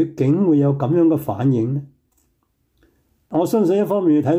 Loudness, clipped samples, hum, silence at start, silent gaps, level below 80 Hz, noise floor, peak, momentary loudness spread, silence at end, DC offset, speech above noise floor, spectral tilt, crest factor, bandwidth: -18 LUFS; under 0.1%; none; 0 s; none; -60 dBFS; -66 dBFS; -8 dBFS; 7 LU; 0 s; under 0.1%; 49 dB; -9 dB/octave; 12 dB; 16 kHz